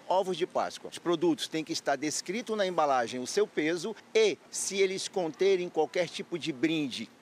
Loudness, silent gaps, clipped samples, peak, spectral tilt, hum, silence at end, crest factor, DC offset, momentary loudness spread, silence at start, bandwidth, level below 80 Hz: -30 LUFS; none; under 0.1%; -14 dBFS; -3.5 dB/octave; none; 0.15 s; 16 dB; under 0.1%; 7 LU; 0.05 s; 15 kHz; -84 dBFS